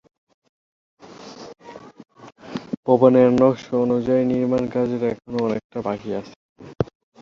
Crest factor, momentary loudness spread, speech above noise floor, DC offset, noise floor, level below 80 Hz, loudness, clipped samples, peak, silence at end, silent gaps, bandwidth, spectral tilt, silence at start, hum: 20 dB; 25 LU; 21 dB; under 0.1%; -40 dBFS; -54 dBFS; -20 LUFS; under 0.1%; -2 dBFS; 0.35 s; 2.77-2.83 s, 5.64-5.70 s, 6.36-6.56 s; 7.2 kHz; -8 dB/octave; 1.1 s; none